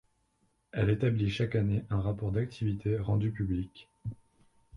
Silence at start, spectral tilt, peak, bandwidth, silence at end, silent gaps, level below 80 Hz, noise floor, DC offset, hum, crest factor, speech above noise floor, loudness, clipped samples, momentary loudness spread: 0.75 s; -8.5 dB/octave; -14 dBFS; 6.8 kHz; 0 s; none; -50 dBFS; -74 dBFS; under 0.1%; none; 16 dB; 44 dB; -31 LUFS; under 0.1%; 15 LU